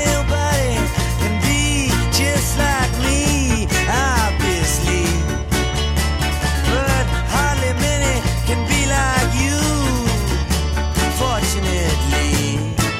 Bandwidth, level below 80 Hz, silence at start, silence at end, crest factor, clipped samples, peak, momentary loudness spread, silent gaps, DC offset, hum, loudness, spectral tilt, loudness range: 16.5 kHz; -22 dBFS; 0 s; 0 s; 14 dB; under 0.1%; -4 dBFS; 3 LU; none; under 0.1%; none; -18 LUFS; -4 dB/octave; 1 LU